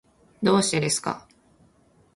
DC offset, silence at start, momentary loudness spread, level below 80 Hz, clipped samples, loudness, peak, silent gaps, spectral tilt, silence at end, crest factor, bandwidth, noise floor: under 0.1%; 0.4 s; 12 LU; -62 dBFS; under 0.1%; -23 LUFS; -6 dBFS; none; -4 dB/octave; 0.95 s; 22 dB; 11.5 kHz; -60 dBFS